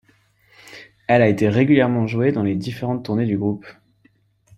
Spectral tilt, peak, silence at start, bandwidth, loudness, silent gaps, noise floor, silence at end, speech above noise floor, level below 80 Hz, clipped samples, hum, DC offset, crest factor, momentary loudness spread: -8 dB/octave; -2 dBFS; 0.7 s; 13 kHz; -19 LUFS; none; -60 dBFS; 0.85 s; 41 dB; -56 dBFS; under 0.1%; none; under 0.1%; 18 dB; 17 LU